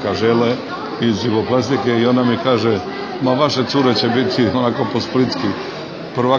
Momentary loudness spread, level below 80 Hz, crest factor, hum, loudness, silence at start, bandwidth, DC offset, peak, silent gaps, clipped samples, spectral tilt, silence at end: 8 LU; -54 dBFS; 16 dB; none; -17 LUFS; 0 s; 7.2 kHz; under 0.1%; -2 dBFS; none; under 0.1%; -6 dB/octave; 0 s